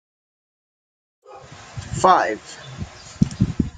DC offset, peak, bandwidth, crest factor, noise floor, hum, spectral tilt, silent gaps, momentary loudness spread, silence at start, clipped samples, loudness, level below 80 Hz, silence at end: under 0.1%; -2 dBFS; 9.4 kHz; 22 dB; -42 dBFS; none; -6 dB/octave; none; 22 LU; 1.3 s; under 0.1%; -20 LUFS; -42 dBFS; 0.05 s